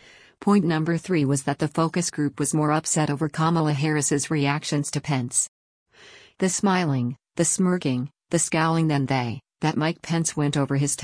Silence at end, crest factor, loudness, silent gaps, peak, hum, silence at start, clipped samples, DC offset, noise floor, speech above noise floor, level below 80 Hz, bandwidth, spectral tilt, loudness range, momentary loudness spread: 0 s; 16 dB; -23 LUFS; 5.48-5.86 s; -8 dBFS; none; 0.4 s; under 0.1%; under 0.1%; -50 dBFS; 27 dB; -60 dBFS; 10.5 kHz; -5 dB/octave; 2 LU; 5 LU